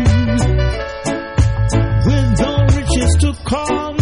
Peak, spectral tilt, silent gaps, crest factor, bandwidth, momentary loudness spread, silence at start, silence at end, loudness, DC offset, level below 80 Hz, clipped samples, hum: -2 dBFS; -6 dB/octave; none; 12 dB; 11 kHz; 6 LU; 0 s; 0 s; -16 LUFS; under 0.1%; -20 dBFS; under 0.1%; none